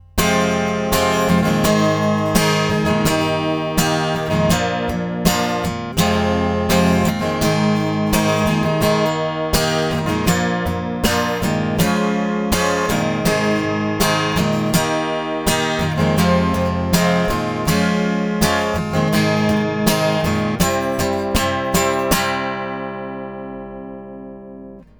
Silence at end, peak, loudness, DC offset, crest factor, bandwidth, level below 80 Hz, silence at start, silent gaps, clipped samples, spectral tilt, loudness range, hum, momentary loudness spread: 0.15 s; 0 dBFS; -18 LUFS; under 0.1%; 18 dB; over 20 kHz; -36 dBFS; 0.15 s; none; under 0.1%; -5 dB/octave; 2 LU; 50 Hz at -50 dBFS; 6 LU